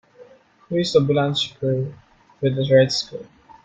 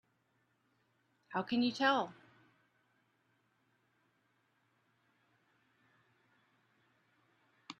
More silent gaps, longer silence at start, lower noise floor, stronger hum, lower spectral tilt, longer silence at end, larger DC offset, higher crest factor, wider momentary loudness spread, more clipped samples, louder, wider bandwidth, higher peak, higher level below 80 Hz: neither; second, 0.2 s vs 1.3 s; second, -49 dBFS vs -78 dBFS; neither; first, -6 dB/octave vs -4.5 dB/octave; first, 0.4 s vs 0.1 s; neither; second, 18 dB vs 24 dB; about the same, 13 LU vs 11 LU; neither; first, -20 LUFS vs -35 LUFS; first, 9.2 kHz vs 8.2 kHz; first, -4 dBFS vs -18 dBFS; first, -58 dBFS vs -86 dBFS